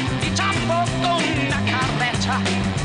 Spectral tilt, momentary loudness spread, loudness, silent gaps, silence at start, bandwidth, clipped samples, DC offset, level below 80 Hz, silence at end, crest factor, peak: -4.5 dB/octave; 1 LU; -20 LUFS; none; 0 s; 10 kHz; under 0.1%; under 0.1%; -38 dBFS; 0 s; 12 dB; -10 dBFS